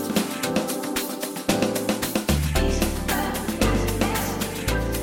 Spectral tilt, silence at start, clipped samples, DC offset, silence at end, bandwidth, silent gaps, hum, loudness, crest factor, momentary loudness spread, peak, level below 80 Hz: -4.5 dB/octave; 0 s; under 0.1%; under 0.1%; 0 s; 17 kHz; none; none; -24 LUFS; 18 dB; 4 LU; -6 dBFS; -32 dBFS